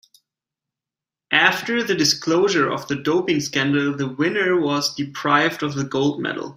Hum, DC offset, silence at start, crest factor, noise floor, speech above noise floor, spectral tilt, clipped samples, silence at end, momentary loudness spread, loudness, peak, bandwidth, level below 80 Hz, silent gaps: none; under 0.1%; 1.3 s; 20 dB; -89 dBFS; 69 dB; -4 dB/octave; under 0.1%; 0.05 s; 7 LU; -20 LUFS; -2 dBFS; 16 kHz; -62 dBFS; none